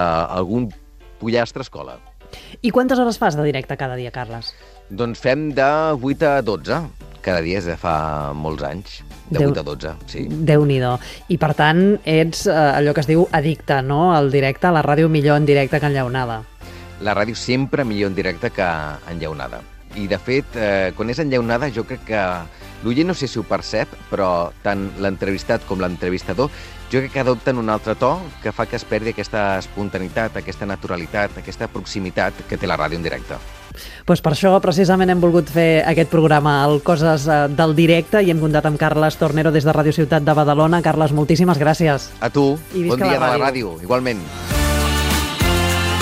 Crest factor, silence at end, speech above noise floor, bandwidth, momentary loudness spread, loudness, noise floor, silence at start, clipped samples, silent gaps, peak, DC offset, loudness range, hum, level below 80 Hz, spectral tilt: 16 dB; 0 s; 21 dB; 15.5 kHz; 13 LU; -18 LUFS; -39 dBFS; 0 s; under 0.1%; none; -2 dBFS; under 0.1%; 7 LU; none; -36 dBFS; -6 dB/octave